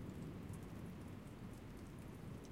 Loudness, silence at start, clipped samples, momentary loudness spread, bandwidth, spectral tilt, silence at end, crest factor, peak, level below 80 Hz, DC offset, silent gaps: -53 LUFS; 0 s; under 0.1%; 3 LU; 16 kHz; -7 dB/octave; 0 s; 12 dB; -38 dBFS; -62 dBFS; under 0.1%; none